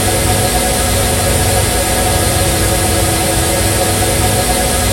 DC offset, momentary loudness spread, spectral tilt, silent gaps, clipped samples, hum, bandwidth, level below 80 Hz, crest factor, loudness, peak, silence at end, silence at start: under 0.1%; 0 LU; -3.5 dB/octave; none; under 0.1%; none; 16 kHz; -22 dBFS; 12 dB; -12 LUFS; 0 dBFS; 0 s; 0 s